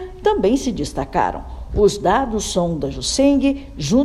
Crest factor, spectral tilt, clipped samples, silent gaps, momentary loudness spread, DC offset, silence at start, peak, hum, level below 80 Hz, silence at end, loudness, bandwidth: 14 dB; -5 dB/octave; under 0.1%; none; 8 LU; under 0.1%; 0 s; -4 dBFS; none; -32 dBFS; 0 s; -19 LUFS; 13.5 kHz